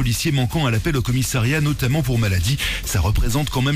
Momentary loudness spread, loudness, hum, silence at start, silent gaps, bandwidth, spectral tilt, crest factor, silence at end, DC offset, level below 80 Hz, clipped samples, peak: 2 LU; -20 LUFS; none; 0 s; none; 15.5 kHz; -5 dB/octave; 8 dB; 0 s; under 0.1%; -28 dBFS; under 0.1%; -12 dBFS